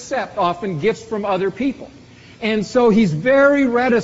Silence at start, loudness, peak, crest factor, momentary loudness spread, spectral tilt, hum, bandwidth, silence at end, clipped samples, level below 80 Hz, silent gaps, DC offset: 0 s; -17 LUFS; -4 dBFS; 14 dB; 10 LU; -5 dB/octave; none; 8 kHz; 0 s; under 0.1%; -50 dBFS; none; under 0.1%